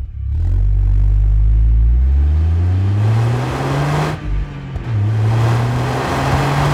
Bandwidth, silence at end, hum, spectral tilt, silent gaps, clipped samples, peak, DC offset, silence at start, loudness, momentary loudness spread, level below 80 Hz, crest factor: 11.5 kHz; 0 s; none; -7 dB/octave; none; under 0.1%; -4 dBFS; under 0.1%; 0 s; -17 LUFS; 7 LU; -18 dBFS; 10 dB